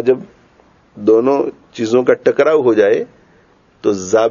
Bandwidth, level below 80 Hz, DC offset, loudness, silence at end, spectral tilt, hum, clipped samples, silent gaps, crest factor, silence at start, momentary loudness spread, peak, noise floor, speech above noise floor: 7.4 kHz; -60 dBFS; under 0.1%; -14 LUFS; 0 s; -5.5 dB/octave; none; under 0.1%; none; 14 dB; 0 s; 9 LU; 0 dBFS; -51 dBFS; 37 dB